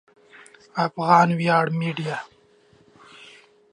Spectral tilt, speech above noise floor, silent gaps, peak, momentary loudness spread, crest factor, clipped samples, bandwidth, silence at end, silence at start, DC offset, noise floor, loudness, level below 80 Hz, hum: -6.5 dB/octave; 36 dB; none; -2 dBFS; 14 LU; 22 dB; under 0.1%; 10.5 kHz; 0.45 s; 0.75 s; under 0.1%; -57 dBFS; -21 LUFS; -72 dBFS; none